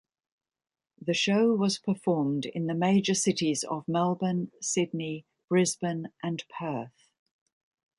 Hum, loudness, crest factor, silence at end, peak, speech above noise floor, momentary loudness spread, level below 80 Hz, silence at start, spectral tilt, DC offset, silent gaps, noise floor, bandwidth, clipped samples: none; -28 LUFS; 16 dB; 1.1 s; -12 dBFS; over 62 dB; 11 LU; -72 dBFS; 1 s; -4.5 dB/octave; under 0.1%; none; under -90 dBFS; 11.5 kHz; under 0.1%